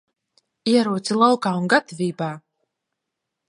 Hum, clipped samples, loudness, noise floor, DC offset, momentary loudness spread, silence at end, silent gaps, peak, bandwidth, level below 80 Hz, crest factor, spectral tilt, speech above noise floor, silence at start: none; under 0.1%; -21 LUFS; -82 dBFS; under 0.1%; 12 LU; 1.1 s; none; -2 dBFS; 11.5 kHz; -74 dBFS; 22 dB; -5 dB/octave; 62 dB; 0.65 s